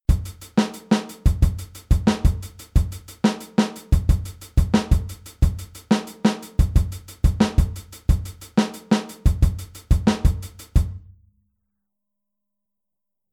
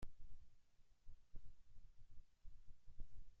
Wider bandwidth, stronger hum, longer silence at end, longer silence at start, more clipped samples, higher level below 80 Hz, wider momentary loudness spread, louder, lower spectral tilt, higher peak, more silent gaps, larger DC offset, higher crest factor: first, 16 kHz vs 3.2 kHz; neither; first, 2.35 s vs 0 s; about the same, 0.1 s vs 0 s; neither; first, -24 dBFS vs -60 dBFS; about the same, 7 LU vs 5 LU; first, -23 LUFS vs -67 LUFS; about the same, -6.5 dB/octave vs -6 dB/octave; first, -4 dBFS vs -36 dBFS; neither; neither; about the same, 18 dB vs 14 dB